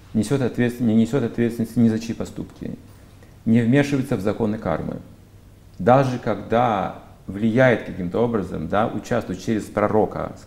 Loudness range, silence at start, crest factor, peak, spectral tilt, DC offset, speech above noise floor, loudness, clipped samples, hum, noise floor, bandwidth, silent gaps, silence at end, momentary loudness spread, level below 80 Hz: 3 LU; 0.1 s; 20 dB; 0 dBFS; -7.5 dB/octave; under 0.1%; 26 dB; -21 LUFS; under 0.1%; none; -47 dBFS; 15 kHz; none; 0 s; 14 LU; -48 dBFS